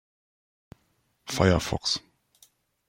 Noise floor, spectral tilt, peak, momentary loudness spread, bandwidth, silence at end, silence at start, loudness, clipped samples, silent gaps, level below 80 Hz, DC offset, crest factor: -71 dBFS; -4.5 dB/octave; -6 dBFS; 12 LU; 16.5 kHz; 0.9 s; 1.25 s; -26 LUFS; under 0.1%; none; -50 dBFS; under 0.1%; 24 dB